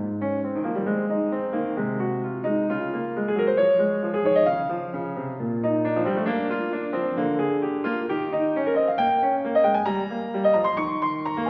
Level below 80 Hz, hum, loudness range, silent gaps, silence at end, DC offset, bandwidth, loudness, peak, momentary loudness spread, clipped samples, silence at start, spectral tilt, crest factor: -64 dBFS; none; 3 LU; none; 0 s; under 0.1%; 5.2 kHz; -24 LUFS; -10 dBFS; 7 LU; under 0.1%; 0 s; -9.5 dB/octave; 14 dB